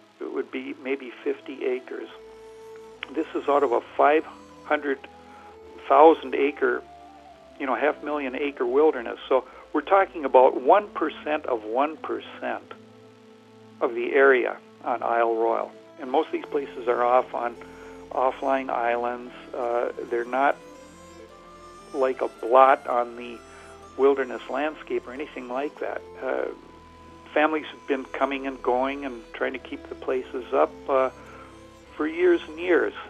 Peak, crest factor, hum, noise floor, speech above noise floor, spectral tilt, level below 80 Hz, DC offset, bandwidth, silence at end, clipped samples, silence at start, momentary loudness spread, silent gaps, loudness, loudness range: -2 dBFS; 22 dB; none; -51 dBFS; 27 dB; -5 dB/octave; -60 dBFS; under 0.1%; 10 kHz; 0 s; under 0.1%; 0.2 s; 18 LU; none; -25 LUFS; 6 LU